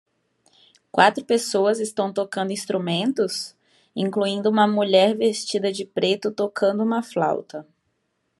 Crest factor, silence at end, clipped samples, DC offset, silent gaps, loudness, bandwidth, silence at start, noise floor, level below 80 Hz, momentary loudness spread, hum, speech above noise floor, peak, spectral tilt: 22 dB; 0.75 s; under 0.1%; under 0.1%; none; -22 LUFS; 13 kHz; 0.95 s; -73 dBFS; -76 dBFS; 10 LU; none; 51 dB; -2 dBFS; -4.5 dB/octave